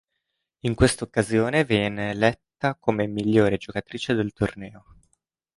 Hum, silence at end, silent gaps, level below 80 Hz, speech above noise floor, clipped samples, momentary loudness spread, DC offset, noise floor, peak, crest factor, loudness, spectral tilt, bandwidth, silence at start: none; 0.8 s; none; -44 dBFS; 56 dB; under 0.1%; 9 LU; under 0.1%; -79 dBFS; -4 dBFS; 20 dB; -24 LUFS; -5.5 dB/octave; 11.5 kHz; 0.65 s